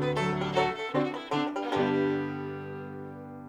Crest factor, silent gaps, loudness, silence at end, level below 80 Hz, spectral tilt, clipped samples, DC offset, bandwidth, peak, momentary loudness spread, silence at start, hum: 18 dB; none; -30 LUFS; 0 s; -60 dBFS; -6.5 dB/octave; under 0.1%; under 0.1%; 11 kHz; -12 dBFS; 13 LU; 0 s; none